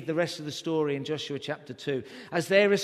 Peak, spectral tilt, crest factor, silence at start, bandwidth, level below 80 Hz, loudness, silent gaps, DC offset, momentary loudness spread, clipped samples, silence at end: -8 dBFS; -5 dB/octave; 20 dB; 0 s; 13.5 kHz; -72 dBFS; -29 LUFS; none; under 0.1%; 12 LU; under 0.1%; 0 s